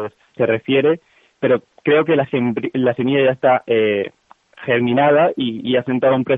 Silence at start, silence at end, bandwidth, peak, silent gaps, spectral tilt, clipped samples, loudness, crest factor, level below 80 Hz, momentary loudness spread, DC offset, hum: 0 s; 0 s; 3.9 kHz; -4 dBFS; none; -9 dB/octave; under 0.1%; -17 LUFS; 14 dB; -62 dBFS; 8 LU; under 0.1%; none